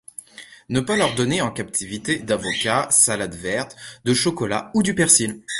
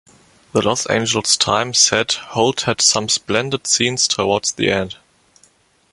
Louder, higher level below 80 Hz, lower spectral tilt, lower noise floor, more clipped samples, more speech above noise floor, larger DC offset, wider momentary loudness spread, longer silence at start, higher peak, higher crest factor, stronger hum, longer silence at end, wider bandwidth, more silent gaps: second, -20 LUFS vs -16 LUFS; about the same, -52 dBFS vs -50 dBFS; about the same, -3 dB/octave vs -2 dB/octave; second, -41 dBFS vs -55 dBFS; neither; second, 20 dB vs 38 dB; neither; first, 11 LU vs 7 LU; second, 0.4 s vs 0.55 s; about the same, 0 dBFS vs 0 dBFS; about the same, 20 dB vs 18 dB; neither; second, 0 s vs 1 s; about the same, 12 kHz vs 11.5 kHz; neither